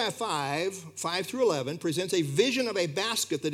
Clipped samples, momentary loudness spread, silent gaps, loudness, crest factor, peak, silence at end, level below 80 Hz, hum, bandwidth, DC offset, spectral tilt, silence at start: under 0.1%; 6 LU; none; -28 LUFS; 18 dB; -10 dBFS; 0 s; -80 dBFS; none; 16.5 kHz; under 0.1%; -3.5 dB/octave; 0 s